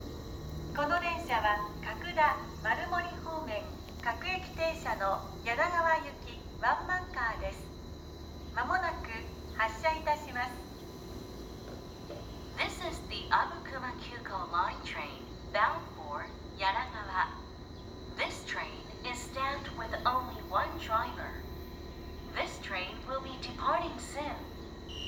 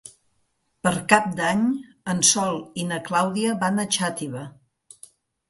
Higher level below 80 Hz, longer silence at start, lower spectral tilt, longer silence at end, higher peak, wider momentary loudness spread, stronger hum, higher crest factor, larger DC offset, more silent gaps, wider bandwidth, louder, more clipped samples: first, -50 dBFS vs -62 dBFS; about the same, 0 s vs 0.05 s; first, -4.5 dB/octave vs -3 dB/octave; second, 0 s vs 1 s; second, -12 dBFS vs 0 dBFS; about the same, 15 LU vs 13 LU; neither; about the same, 22 dB vs 24 dB; neither; neither; first, 19.5 kHz vs 12 kHz; second, -34 LUFS vs -22 LUFS; neither